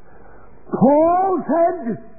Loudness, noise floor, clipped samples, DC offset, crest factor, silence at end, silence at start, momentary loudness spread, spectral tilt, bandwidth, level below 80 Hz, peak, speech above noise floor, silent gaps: -17 LUFS; -46 dBFS; under 0.1%; 1%; 16 dB; 0.2 s; 0.7 s; 11 LU; -15.5 dB/octave; 2.6 kHz; -54 dBFS; -2 dBFS; 29 dB; none